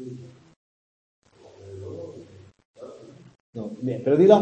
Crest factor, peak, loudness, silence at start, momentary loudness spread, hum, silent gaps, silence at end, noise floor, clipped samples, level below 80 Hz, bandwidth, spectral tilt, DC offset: 24 dB; -2 dBFS; -24 LUFS; 0 s; 27 LU; none; 0.56-1.22 s, 2.65-2.74 s, 3.40-3.53 s; 0 s; -48 dBFS; under 0.1%; -68 dBFS; 8.4 kHz; -8 dB/octave; under 0.1%